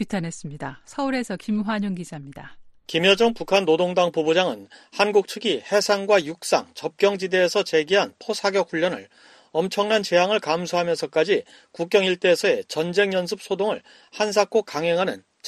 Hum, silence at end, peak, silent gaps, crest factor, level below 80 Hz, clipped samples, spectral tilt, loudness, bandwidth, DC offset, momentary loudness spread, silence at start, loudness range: none; 0 s; -4 dBFS; none; 18 dB; -64 dBFS; under 0.1%; -4 dB/octave; -22 LUFS; 13 kHz; under 0.1%; 13 LU; 0 s; 2 LU